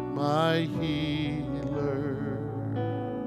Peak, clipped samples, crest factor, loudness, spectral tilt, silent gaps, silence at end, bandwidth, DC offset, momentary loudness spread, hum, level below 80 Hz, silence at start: -12 dBFS; under 0.1%; 16 dB; -30 LUFS; -7.5 dB/octave; none; 0 s; 13.5 kHz; under 0.1%; 7 LU; none; -52 dBFS; 0 s